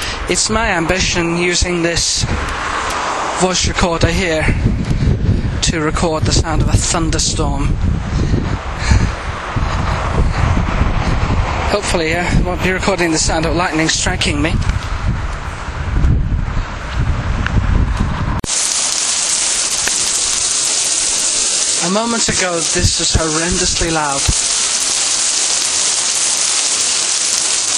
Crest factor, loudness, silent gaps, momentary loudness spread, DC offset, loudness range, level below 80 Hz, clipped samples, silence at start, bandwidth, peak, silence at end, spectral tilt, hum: 16 dB; -15 LUFS; none; 7 LU; under 0.1%; 5 LU; -22 dBFS; under 0.1%; 0 s; 14 kHz; 0 dBFS; 0 s; -3 dB/octave; none